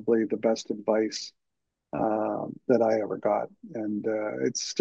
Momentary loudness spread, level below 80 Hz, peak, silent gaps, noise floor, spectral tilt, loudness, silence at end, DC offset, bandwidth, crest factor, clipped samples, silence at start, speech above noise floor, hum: 11 LU; -72 dBFS; -10 dBFS; none; -83 dBFS; -4.5 dB/octave; -28 LUFS; 0 s; under 0.1%; 8.2 kHz; 18 dB; under 0.1%; 0 s; 56 dB; none